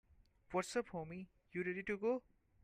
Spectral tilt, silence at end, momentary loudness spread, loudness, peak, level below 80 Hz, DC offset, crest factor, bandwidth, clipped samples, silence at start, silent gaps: -5.5 dB/octave; 0.45 s; 9 LU; -43 LUFS; -24 dBFS; -72 dBFS; under 0.1%; 20 dB; 15 kHz; under 0.1%; 0.5 s; none